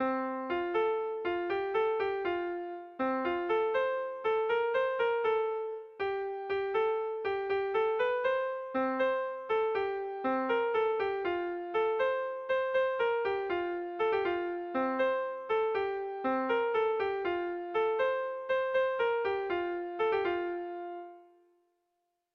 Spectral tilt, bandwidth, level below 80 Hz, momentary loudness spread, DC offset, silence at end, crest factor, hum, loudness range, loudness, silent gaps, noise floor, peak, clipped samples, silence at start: -6 dB/octave; 5.8 kHz; -70 dBFS; 5 LU; under 0.1%; 1.1 s; 12 dB; none; 1 LU; -32 LUFS; none; -82 dBFS; -20 dBFS; under 0.1%; 0 s